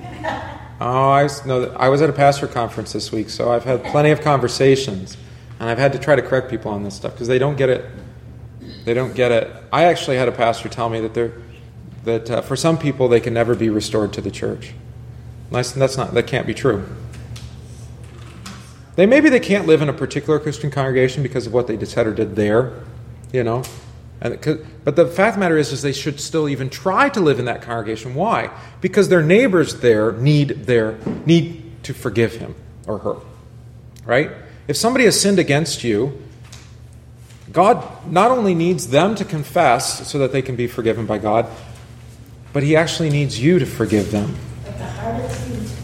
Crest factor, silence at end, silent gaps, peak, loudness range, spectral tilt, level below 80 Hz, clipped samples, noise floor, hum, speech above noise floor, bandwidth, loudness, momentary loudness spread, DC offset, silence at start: 18 dB; 0 s; none; 0 dBFS; 5 LU; -5.5 dB/octave; -44 dBFS; under 0.1%; -41 dBFS; none; 23 dB; 16 kHz; -18 LUFS; 19 LU; under 0.1%; 0 s